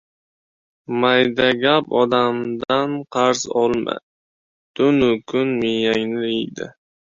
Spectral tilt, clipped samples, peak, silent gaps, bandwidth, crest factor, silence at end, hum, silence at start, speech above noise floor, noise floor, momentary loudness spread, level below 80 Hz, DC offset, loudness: -4.5 dB/octave; under 0.1%; -2 dBFS; 4.03-4.74 s; 7.8 kHz; 18 dB; 0.5 s; none; 0.9 s; over 72 dB; under -90 dBFS; 11 LU; -56 dBFS; under 0.1%; -19 LUFS